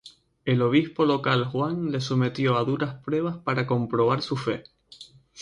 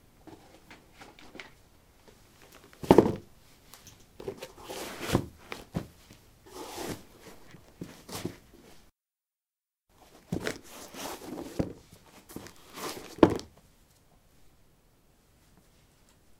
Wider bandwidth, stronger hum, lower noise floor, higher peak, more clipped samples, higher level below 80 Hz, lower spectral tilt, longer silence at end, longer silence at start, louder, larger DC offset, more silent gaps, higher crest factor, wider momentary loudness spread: second, 10.5 kHz vs 16.5 kHz; neither; second, -50 dBFS vs under -90 dBFS; second, -8 dBFS vs -2 dBFS; neither; about the same, -60 dBFS vs -56 dBFS; about the same, -7 dB/octave vs -6 dB/octave; second, 0 s vs 2.95 s; second, 0.05 s vs 0.25 s; first, -25 LUFS vs -31 LUFS; neither; neither; second, 16 dB vs 34 dB; second, 7 LU vs 29 LU